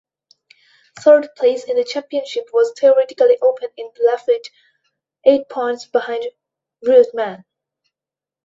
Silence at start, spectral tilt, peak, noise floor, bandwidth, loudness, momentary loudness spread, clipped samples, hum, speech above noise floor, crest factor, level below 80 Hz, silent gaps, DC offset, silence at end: 0.95 s; -4 dB/octave; 0 dBFS; -89 dBFS; 7.8 kHz; -17 LUFS; 12 LU; under 0.1%; none; 73 dB; 18 dB; -70 dBFS; none; under 0.1%; 1.1 s